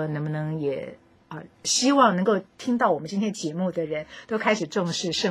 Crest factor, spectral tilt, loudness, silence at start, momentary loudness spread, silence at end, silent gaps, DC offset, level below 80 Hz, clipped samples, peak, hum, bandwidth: 20 dB; -4 dB/octave; -25 LUFS; 0 s; 14 LU; 0 s; none; under 0.1%; -66 dBFS; under 0.1%; -4 dBFS; none; 15 kHz